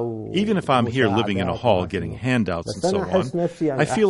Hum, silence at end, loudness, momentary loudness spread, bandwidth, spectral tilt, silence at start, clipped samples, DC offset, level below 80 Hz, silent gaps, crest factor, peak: none; 0 s; -22 LUFS; 5 LU; 11.5 kHz; -6 dB/octave; 0 s; under 0.1%; under 0.1%; -48 dBFS; none; 18 dB; -2 dBFS